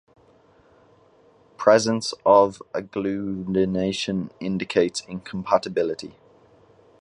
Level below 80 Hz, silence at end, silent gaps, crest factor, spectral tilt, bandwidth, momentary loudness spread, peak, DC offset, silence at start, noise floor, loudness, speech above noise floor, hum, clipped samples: -58 dBFS; 0.9 s; none; 22 dB; -5 dB/octave; 11 kHz; 14 LU; -2 dBFS; under 0.1%; 1.6 s; -56 dBFS; -23 LUFS; 34 dB; none; under 0.1%